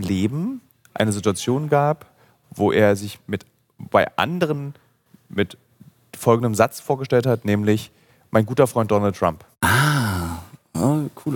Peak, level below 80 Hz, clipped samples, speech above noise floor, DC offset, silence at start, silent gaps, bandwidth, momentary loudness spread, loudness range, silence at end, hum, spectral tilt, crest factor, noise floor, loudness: -2 dBFS; -52 dBFS; under 0.1%; 30 dB; under 0.1%; 0 s; none; 17.5 kHz; 13 LU; 3 LU; 0 s; none; -6 dB/octave; 20 dB; -50 dBFS; -21 LUFS